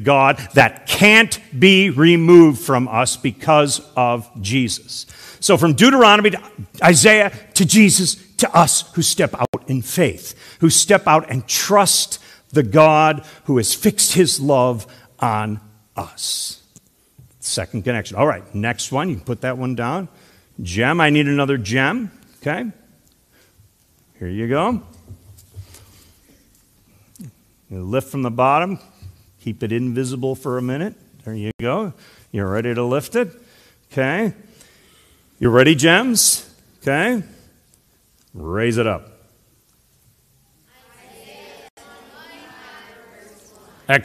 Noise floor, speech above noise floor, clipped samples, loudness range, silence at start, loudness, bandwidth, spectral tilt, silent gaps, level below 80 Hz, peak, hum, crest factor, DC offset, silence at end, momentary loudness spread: -58 dBFS; 42 dB; under 0.1%; 14 LU; 0 s; -16 LUFS; 15 kHz; -4 dB/octave; 9.48-9.53 s, 31.54-31.59 s, 41.70-41.77 s; -52 dBFS; 0 dBFS; none; 18 dB; under 0.1%; 0 s; 18 LU